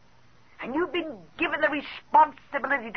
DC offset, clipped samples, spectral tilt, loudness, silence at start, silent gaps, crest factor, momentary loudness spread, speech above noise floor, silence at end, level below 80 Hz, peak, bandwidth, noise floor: 0.2%; under 0.1%; -5.5 dB/octave; -26 LUFS; 0.6 s; none; 18 dB; 12 LU; 33 dB; 0.05 s; -62 dBFS; -8 dBFS; 6.2 kHz; -59 dBFS